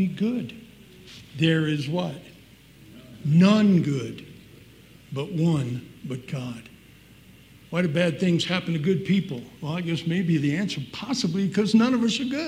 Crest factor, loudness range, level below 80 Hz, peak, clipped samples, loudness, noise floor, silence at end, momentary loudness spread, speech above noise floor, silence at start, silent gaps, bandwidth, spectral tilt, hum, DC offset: 18 dB; 7 LU; -62 dBFS; -6 dBFS; under 0.1%; -24 LUFS; -51 dBFS; 0 s; 16 LU; 27 dB; 0 s; none; 15 kHz; -6.5 dB/octave; none; under 0.1%